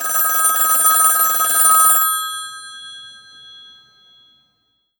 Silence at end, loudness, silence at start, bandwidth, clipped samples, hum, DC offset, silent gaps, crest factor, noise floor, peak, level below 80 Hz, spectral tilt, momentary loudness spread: 1.85 s; -12 LUFS; 0 s; over 20 kHz; under 0.1%; none; under 0.1%; none; 18 dB; -66 dBFS; 0 dBFS; -74 dBFS; 3 dB/octave; 22 LU